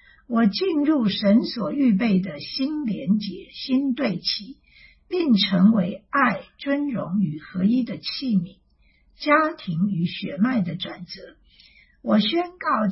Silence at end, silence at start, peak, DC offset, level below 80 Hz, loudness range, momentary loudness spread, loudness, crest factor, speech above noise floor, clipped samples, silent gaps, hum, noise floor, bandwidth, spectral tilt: 0 s; 0.3 s; -6 dBFS; under 0.1%; -60 dBFS; 3 LU; 11 LU; -23 LUFS; 18 dB; 38 dB; under 0.1%; none; none; -60 dBFS; 5.8 kHz; -9 dB/octave